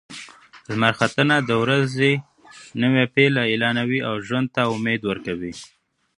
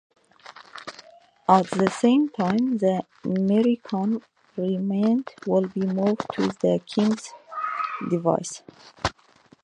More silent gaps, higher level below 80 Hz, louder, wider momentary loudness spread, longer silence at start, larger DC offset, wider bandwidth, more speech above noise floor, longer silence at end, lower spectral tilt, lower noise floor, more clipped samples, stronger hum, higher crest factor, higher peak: neither; about the same, -58 dBFS vs -56 dBFS; first, -20 LUFS vs -24 LUFS; about the same, 13 LU vs 14 LU; second, 0.1 s vs 0.5 s; neither; about the same, 11 kHz vs 10.5 kHz; second, 22 dB vs 34 dB; about the same, 0.5 s vs 0.5 s; about the same, -6 dB/octave vs -6.5 dB/octave; second, -43 dBFS vs -57 dBFS; neither; neither; about the same, 20 dB vs 22 dB; about the same, 0 dBFS vs -2 dBFS